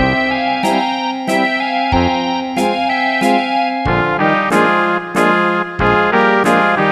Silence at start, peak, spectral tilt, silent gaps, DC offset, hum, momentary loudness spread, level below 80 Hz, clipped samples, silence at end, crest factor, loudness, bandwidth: 0 s; 0 dBFS; -5.5 dB/octave; none; under 0.1%; none; 5 LU; -36 dBFS; under 0.1%; 0 s; 14 dB; -14 LUFS; 14.5 kHz